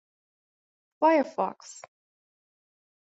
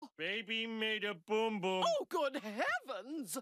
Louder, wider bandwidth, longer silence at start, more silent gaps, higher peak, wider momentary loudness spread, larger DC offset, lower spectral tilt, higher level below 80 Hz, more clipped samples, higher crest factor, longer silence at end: first, -26 LUFS vs -37 LUFS; second, 8 kHz vs 15 kHz; first, 1 s vs 0 s; neither; first, -10 dBFS vs -22 dBFS; first, 22 LU vs 5 LU; neither; first, -4.5 dB/octave vs -3 dB/octave; first, -84 dBFS vs under -90 dBFS; neither; first, 20 dB vs 14 dB; first, 1.25 s vs 0 s